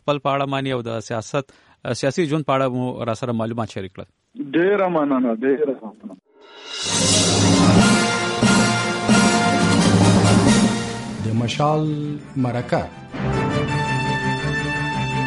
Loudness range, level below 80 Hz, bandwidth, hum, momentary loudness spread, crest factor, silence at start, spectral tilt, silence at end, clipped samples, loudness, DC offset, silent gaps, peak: 8 LU; -44 dBFS; 11.5 kHz; none; 13 LU; 16 dB; 0.05 s; -4.5 dB/octave; 0 s; under 0.1%; -19 LUFS; under 0.1%; none; -4 dBFS